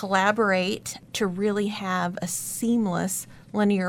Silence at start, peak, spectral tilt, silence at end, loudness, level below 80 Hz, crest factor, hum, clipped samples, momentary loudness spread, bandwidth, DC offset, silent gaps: 0 s; -8 dBFS; -4.5 dB/octave; 0 s; -26 LUFS; -62 dBFS; 18 dB; none; under 0.1%; 9 LU; 18 kHz; under 0.1%; none